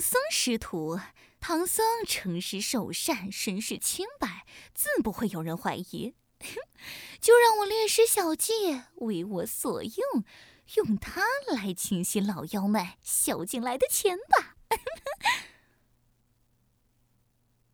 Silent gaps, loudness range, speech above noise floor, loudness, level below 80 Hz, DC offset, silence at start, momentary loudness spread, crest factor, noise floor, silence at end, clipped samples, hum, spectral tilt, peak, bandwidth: none; 7 LU; 42 dB; -28 LUFS; -60 dBFS; under 0.1%; 0 s; 14 LU; 24 dB; -70 dBFS; 2.25 s; under 0.1%; none; -3 dB/octave; -6 dBFS; over 20 kHz